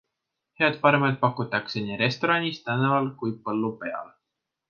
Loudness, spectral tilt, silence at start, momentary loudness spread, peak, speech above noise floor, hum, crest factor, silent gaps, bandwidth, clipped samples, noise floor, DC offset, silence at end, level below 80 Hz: -25 LUFS; -7 dB/octave; 0.6 s; 11 LU; -4 dBFS; 59 dB; none; 22 dB; none; 7 kHz; under 0.1%; -84 dBFS; under 0.1%; 0.65 s; -68 dBFS